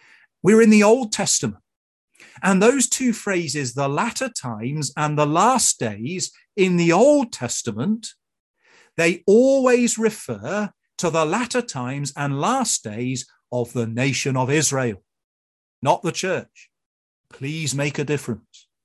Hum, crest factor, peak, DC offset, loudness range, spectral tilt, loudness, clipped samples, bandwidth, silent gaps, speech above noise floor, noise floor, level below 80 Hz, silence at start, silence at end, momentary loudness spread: none; 18 dB; -2 dBFS; under 0.1%; 5 LU; -4.5 dB/octave; -20 LUFS; under 0.1%; 12.5 kHz; 1.76-2.08 s, 8.40-8.54 s, 15.24-15.82 s, 16.86-17.24 s; over 70 dB; under -90 dBFS; -62 dBFS; 0.45 s; 0.45 s; 12 LU